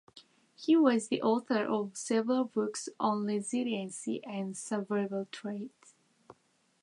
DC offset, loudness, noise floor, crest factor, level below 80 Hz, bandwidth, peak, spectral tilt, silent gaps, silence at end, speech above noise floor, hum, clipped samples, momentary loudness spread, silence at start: under 0.1%; -32 LUFS; -71 dBFS; 18 dB; -86 dBFS; 11.5 kHz; -14 dBFS; -5 dB/octave; none; 0.5 s; 40 dB; none; under 0.1%; 12 LU; 0.15 s